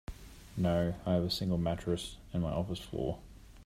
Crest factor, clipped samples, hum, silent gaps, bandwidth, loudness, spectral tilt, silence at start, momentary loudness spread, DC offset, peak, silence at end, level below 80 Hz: 18 dB; under 0.1%; none; none; 15 kHz; -34 LUFS; -6.5 dB/octave; 0.1 s; 13 LU; under 0.1%; -18 dBFS; 0 s; -50 dBFS